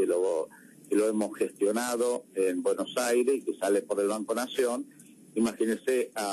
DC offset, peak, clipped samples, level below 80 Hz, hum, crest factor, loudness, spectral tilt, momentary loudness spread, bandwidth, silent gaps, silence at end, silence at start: under 0.1%; -16 dBFS; under 0.1%; -76 dBFS; none; 12 dB; -29 LUFS; -3.5 dB/octave; 5 LU; 13.5 kHz; none; 0 s; 0 s